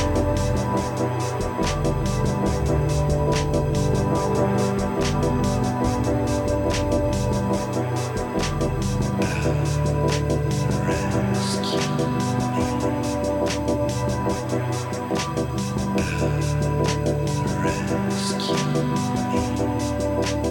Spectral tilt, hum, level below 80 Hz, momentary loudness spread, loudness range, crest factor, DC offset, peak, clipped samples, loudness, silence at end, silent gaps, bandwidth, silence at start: -6 dB/octave; none; -34 dBFS; 3 LU; 2 LU; 14 dB; under 0.1%; -8 dBFS; under 0.1%; -23 LUFS; 0 s; none; 16.5 kHz; 0 s